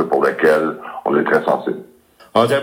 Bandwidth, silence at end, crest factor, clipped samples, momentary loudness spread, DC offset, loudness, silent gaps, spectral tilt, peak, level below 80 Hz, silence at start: 16.5 kHz; 0 s; 16 dB; under 0.1%; 10 LU; under 0.1%; -17 LUFS; none; -6 dB/octave; 0 dBFS; -66 dBFS; 0 s